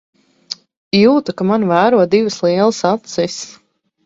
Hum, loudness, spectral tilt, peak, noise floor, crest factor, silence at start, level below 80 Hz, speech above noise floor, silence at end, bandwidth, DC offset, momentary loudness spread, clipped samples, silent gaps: none; -14 LUFS; -5.5 dB/octave; 0 dBFS; -33 dBFS; 16 dB; 0.5 s; -56 dBFS; 20 dB; 0.55 s; 7.8 kHz; under 0.1%; 18 LU; under 0.1%; 0.77-0.91 s